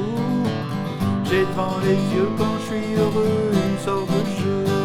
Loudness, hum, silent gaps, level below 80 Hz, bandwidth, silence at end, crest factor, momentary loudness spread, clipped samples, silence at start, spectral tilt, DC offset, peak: -22 LUFS; none; none; -50 dBFS; 16 kHz; 0 s; 14 dB; 4 LU; under 0.1%; 0 s; -7 dB/octave; under 0.1%; -6 dBFS